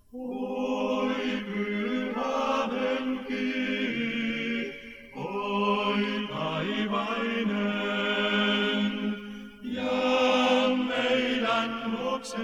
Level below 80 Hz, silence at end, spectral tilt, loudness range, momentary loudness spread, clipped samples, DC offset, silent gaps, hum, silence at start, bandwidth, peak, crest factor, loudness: -60 dBFS; 0 s; -5 dB/octave; 3 LU; 9 LU; under 0.1%; under 0.1%; none; none; 0.15 s; 12.5 kHz; -12 dBFS; 16 dB; -28 LUFS